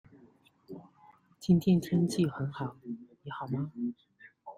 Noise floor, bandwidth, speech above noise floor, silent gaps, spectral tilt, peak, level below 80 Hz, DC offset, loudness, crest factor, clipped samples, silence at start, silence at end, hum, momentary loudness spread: -62 dBFS; 14 kHz; 32 dB; none; -7.5 dB/octave; -14 dBFS; -66 dBFS; under 0.1%; -31 LUFS; 18 dB; under 0.1%; 0.7 s; 0.05 s; none; 23 LU